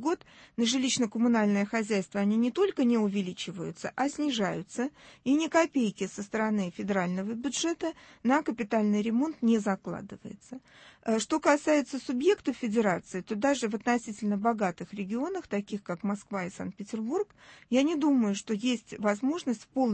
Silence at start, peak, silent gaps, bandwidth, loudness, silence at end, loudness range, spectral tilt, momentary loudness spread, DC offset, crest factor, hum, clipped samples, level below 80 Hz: 0 s; -12 dBFS; none; 8.8 kHz; -29 LUFS; 0 s; 3 LU; -5 dB/octave; 11 LU; under 0.1%; 18 dB; none; under 0.1%; -68 dBFS